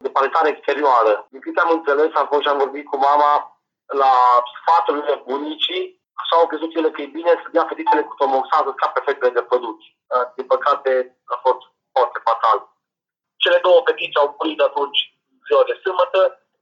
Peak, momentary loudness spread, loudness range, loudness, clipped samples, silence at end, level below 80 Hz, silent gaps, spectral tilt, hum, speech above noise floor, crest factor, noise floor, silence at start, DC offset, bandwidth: -4 dBFS; 8 LU; 3 LU; -18 LUFS; under 0.1%; 0.25 s; -90 dBFS; none; -2.5 dB/octave; none; 67 dB; 16 dB; -85 dBFS; 0.05 s; under 0.1%; 7.2 kHz